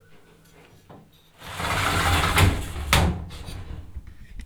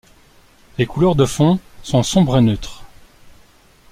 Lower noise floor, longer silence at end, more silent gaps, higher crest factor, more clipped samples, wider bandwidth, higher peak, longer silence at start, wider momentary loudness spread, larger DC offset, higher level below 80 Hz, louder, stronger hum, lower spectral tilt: about the same, -52 dBFS vs -50 dBFS; second, 0 s vs 1.05 s; neither; first, 24 dB vs 16 dB; neither; first, over 20 kHz vs 15.5 kHz; about the same, -2 dBFS vs -2 dBFS; second, 0.1 s vs 0.8 s; first, 21 LU vs 11 LU; neither; about the same, -34 dBFS vs -38 dBFS; second, -22 LUFS vs -17 LUFS; neither; second, -4 dB/octave vs -6.5 dB/octave